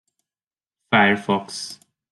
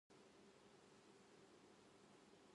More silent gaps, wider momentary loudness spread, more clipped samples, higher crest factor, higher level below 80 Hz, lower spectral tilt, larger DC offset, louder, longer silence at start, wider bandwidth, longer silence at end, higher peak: neither; first, 15 LU vs 1 LU; neither; first, 22 dB vs 12 dB; first, -66 dBFS vs under -90 dBFS; about the same, -4.5 dB/octave vs -4 dB/octave; neither; first, -19 LUFS vs -69 LUFS; first, 0.9 s vs 0.1 s; about the same, 12 kHz vs 11 kHz; first, 0.35 s vs 0 s; first, -2 dBFS vs -56 dBFS